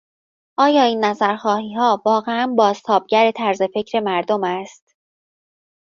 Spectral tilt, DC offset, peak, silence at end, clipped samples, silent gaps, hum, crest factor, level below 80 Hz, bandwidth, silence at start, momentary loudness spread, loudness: -5 dB/octave; under 0.1%; -2 dBFS; 1.25 s; under 0.1%; none; none; 16 dB; -68 dBFS; 7.4 kHz; 0.6 s; 6 LU; -18 LUFS